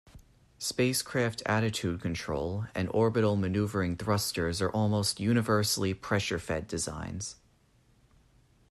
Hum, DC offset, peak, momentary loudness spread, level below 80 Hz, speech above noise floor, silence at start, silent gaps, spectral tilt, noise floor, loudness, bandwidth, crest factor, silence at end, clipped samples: none; under 0.1%; -14 dBFS; 8 LU; -56 dBFS; 35 dB; 0.05 s; none; -5 dB/octave; -65 dBFS; -30 LUFS; 14 kHz; 16 dB; 1.4 s; under 0.1%